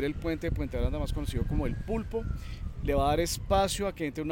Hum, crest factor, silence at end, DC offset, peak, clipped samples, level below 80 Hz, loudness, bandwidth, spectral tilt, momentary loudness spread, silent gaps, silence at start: none; 16 dB; 0 s; under 0.1%; -14 dBFS; under 0.1%; -36 dBFS; -31 LUFS; 17 kHz; -5.5 dB/octave; 8 LU; none; 0 s